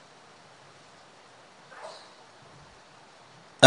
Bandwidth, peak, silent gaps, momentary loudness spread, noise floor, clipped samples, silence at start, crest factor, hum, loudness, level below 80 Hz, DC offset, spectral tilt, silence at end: 10.5 kHz; 0 dBFS; none; 8 LU; -54 dBFS; under 0.1%; 3.6 s; 30 dB; none; -50 LUFS; -76 dBFS; under 0.1%; -3 dB/octave; 0 s